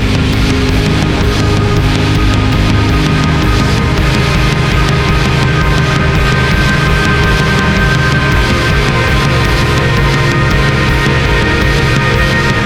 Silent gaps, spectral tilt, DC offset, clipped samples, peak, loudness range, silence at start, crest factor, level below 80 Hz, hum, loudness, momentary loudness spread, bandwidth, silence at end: none; -5.5 dB/octave; under 0.1%; under 0.1%; 0 dBFS; 1 LU; 0 s; 10 dB; -16 dBFS; none; -10 LUFS; 1 LU; 17 kHz; 0 s